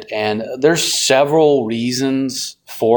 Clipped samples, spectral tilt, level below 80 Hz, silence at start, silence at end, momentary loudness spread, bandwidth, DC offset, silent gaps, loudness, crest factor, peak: under 0.1%; -3.5 dB/octave; -58 dBFS; 0 s; 0 s; 8 LU; 19.5 kHz; under 0.1%; none; -16 LUFS; 16 dB; 0 dBFS